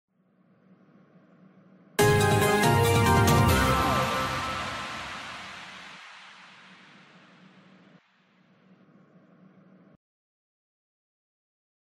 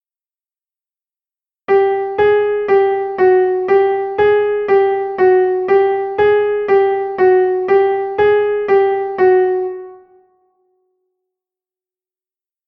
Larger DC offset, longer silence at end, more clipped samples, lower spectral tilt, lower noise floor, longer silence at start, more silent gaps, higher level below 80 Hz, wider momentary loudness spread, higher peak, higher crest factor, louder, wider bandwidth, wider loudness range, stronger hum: neither; first, 5.75 s vs 2.75 s; neither; second, -5 dB/octave vs -7.5 dB/octave; second, -64 dBFS vs under -90 dBFS; first, 2 s vs 1.7 s; neither; first, -44 dBFS vs -54 dBFS; first, 23 LU vs 4 LU; second, -10 dBFS vs -2 dBFS; about the same, 18 dB vs 14 dB; second, -24 LUFS vs -14 LUFS; first, 16 kHz vs 4.9 kHz; first, 20 LU vs 5 LU; neither